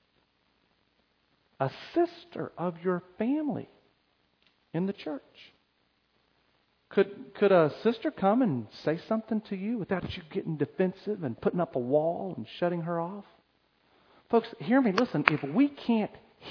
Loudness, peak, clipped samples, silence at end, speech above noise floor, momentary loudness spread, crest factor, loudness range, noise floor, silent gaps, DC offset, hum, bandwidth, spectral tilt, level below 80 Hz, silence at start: -30 LUFS; 0 dBFS; under 0.1%; 0 s; 43 dB; 12 LU; 30 dB; 8 LU; -72 dBFS; none; under 0.1%; none; 5.4 kHz; -8 dB/octave; -68 dBFS; 1.6 s